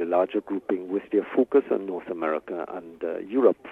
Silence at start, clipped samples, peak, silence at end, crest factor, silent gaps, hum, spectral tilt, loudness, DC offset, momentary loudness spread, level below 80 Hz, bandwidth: 0 s; under 0.1%; -6 dBFS; 0 s; 20 dB; none; none; -8.5 dB/octave; -26 LUFS; under 0.1%; 11 LU; -70 dBFS; 3.9 kHz